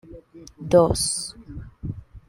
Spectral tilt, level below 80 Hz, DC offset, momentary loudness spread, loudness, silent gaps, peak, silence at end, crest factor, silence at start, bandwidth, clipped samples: -4.5 dB/octave; -42 dBFS; under 0.1%; 22 LU; -20 LUFS; none; -4 dBFS; 0.1 s; 20 dB; 0.1 s; 16 kHz; under 0.1%